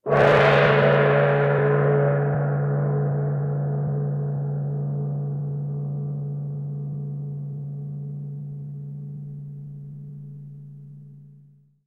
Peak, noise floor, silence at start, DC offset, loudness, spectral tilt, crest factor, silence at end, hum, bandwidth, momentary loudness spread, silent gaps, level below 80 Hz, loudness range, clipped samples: -4 dBFS; -54 dBFS; 0.05 s; under 0.1%; -23 LUFS; -8.5 dB/octave; 18 dB; 0.55 s; none; 5.6 kHz; 21 LU; none; -56 dBFS; 16 LU; under 0.1%